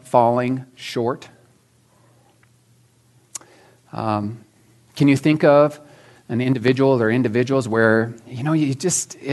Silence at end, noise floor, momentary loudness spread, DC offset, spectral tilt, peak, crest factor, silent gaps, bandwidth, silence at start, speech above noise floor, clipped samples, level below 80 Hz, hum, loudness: 0 s; -57 dBFS; 19 LU; under 0.1%; -5.5 dB/octave; -2 dBFS; 20 dB; none; 12 kHz; 0.05 s; 39 dB; under 0.1%; -66 dBFS; none; -19 LUFS